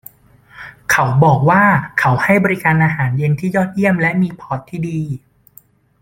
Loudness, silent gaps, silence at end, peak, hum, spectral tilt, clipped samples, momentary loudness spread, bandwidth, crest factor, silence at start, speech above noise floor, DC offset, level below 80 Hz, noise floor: -15 LUFS; none; 0.85 s; -2 dBFS; none; -7 dB/octave; under 0.1%; 15 LU; 16.5 kHz; 14 dB; 0.55 s; 34 dB; under 0.1%; -48 dBFS; -49 dBFS